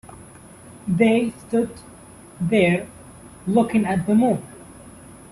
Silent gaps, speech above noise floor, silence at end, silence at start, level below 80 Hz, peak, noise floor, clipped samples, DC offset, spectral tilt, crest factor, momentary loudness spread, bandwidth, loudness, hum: none; 25 dB; 0.15 s; 0.1 s; -54 dBFS; -6 dBFS; -44 dBFS; under 0.1%; under 0.1%; -7 dB/octave; 18 dB; 23 LU; 12.5 kHz; -21 LUFS; none